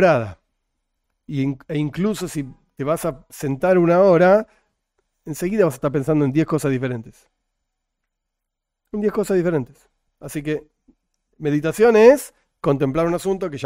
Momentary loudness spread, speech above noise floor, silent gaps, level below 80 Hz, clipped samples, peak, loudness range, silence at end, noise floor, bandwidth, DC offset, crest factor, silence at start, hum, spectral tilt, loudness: 17 LU; 62 dB; none; -50 dBFS; under 0.1%; 0 dBFS; 8 LU; 0 s; -81 dBFS; 16 kHz; under 0.1%; 20 dB; 0 s; none; -7 dB/octave; -19 LUFS